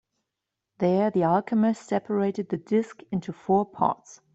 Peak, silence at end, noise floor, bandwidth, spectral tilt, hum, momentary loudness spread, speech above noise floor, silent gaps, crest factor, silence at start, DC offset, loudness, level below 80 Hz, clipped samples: -8 dBFS; 0.2 s; -85 dBFS; 8 kHz; -8 dB/octave; none; 9 LU; 60 dB; none; 18 dB; 0.8 s; under 0.1%; -26 LUFS; -66 dBFS; under 0.1%